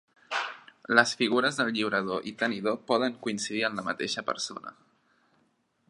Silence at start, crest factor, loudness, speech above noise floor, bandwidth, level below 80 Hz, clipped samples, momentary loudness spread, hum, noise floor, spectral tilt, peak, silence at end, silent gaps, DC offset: 0.3 s; 26 dB; -28 LUFS; 42 dB; 11.5 kHz; -74 dBFS; under 0.1%; 11 LU; none; -71 dBFS; -3 dB/octave; -4 dBFS; 1.15 s; none; under 0.1%